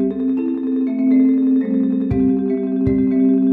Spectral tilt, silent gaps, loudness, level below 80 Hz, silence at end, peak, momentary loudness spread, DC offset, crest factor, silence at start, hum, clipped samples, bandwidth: -12 dB/octave; none; -17 LUFS; -42 dBFS; 0 s; -4 dBFS; 5 LU; under 0.1%; 12 dB; 0 s; none; under 0.1%; 3.9 kHz